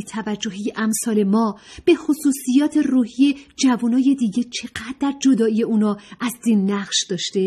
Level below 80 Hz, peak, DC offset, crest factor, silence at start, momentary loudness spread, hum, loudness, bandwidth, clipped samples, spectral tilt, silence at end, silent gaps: -58 dBFS; -4 dBFS; under 0.1%; 14 dB; 0 s; 8 LU; none; -20 LUFS; 14 kHz; under 0.1%; -4.5 dB/octave; 0 s; none